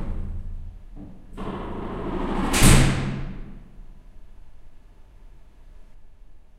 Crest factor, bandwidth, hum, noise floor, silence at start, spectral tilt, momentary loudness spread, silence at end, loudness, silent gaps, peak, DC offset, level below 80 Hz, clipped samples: 24 dB; 16 kHz; none; -46 dBFS; 0 s; -4.5 dB/octave; 28 LU; 0.2 s; -23 LUFS; none; -2 dBFS; under 0.1%; -28 dBFS; under 0.1%